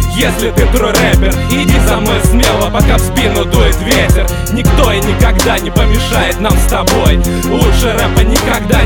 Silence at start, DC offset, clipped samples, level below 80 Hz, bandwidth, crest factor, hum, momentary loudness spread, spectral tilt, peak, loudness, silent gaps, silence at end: 0 s; under 0.1%; 0.2%; -14 dBFS; 19.5 kHz; 10 dB; none; 2 LU; -5 dB/octave; 0 dBFS; -11 LUFS; none; 0 s